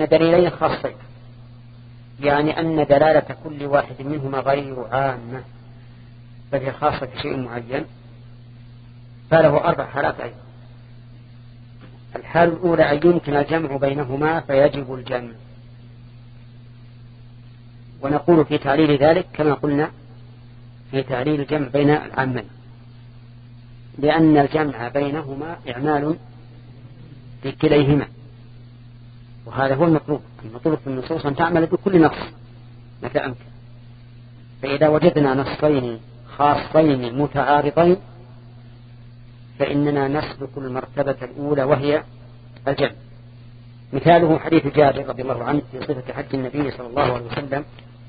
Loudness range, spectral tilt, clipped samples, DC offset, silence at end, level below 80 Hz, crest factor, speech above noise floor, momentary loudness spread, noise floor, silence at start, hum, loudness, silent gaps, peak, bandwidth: 6 LU; -12 dB/octave; under 0.1%; under 0.1%; 0 s; -48 dBFS; 20 dB; 23 dB; 15 LU; -42 dBFS; 0 s; none; -20 LUFS; none; 0 dBFS; 5 kHz